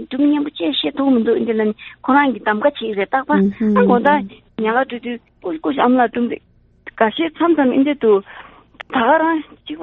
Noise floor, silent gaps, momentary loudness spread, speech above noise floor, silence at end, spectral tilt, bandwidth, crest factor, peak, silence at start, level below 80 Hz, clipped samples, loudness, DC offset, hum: -41 dBFS; none; 10 LU; 25 dB; 0 s; -4 dB/octave; 4.2 kHz; 16 dB; 0 dBFS; 0 s; -56 dBFS; under 0.1%; -17 LUFS; under 0.1%; none